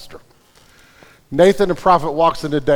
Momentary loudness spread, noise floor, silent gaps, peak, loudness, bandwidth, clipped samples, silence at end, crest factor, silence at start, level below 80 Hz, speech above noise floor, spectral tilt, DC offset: 6 LU; -50 dBFS; none; 0 dBFS; -15 LUFS; 16.5 kHz; under 0.1%; 0 s; 16 dB; 0 s; -42 dBFS; 36 dB; -6 dB/octave; under 0.1%